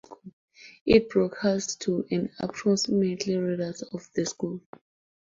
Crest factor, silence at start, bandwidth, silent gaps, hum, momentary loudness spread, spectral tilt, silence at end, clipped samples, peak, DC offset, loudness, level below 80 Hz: 22 dB; 0.1 s; 7.8 kHz; 0.33-0.48 s, 0.81-0.86 s; none; 12 LU; -5 dB/octave; 0.65 s; under 0.1%; -6 dBFS; under 0.1%; -27 LUFS; -54 dBFS